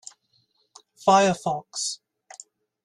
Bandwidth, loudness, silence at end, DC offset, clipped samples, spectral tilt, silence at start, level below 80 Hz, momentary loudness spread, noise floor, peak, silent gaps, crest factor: 12.5 kHz; -23 LUFS; 0.9 s; under 0.1%; under 0.1%; -3.5 dB/octave; 1.05 s; -68 dBFS; 26 LU; -68 dBFS; -6 dBFS; none; 22 dB